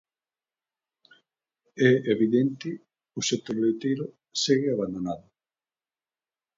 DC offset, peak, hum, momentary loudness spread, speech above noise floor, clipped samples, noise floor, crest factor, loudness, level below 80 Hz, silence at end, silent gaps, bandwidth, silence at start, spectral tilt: under 0.1%; -6 dBFS; none; 15 LU; over 65 dB; under 0.1%; under -90 dBFS; 22 dB; -26 LUFS; -68 dBFS; 1.4 s; none; 7.8 kHz; 1.75 s; -5 dB/octave